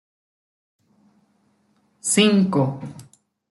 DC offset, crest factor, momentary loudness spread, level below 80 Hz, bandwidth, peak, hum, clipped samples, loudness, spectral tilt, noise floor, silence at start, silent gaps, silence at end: under 0.1%; 20 dB; 18 LU; -68 dBFS; 12 kHz; -4 dBFS; none; under 0.1%; -19 LUFS; -4.5 dB/octave; -64 dBFS; 2.05 s; none; 0.5 s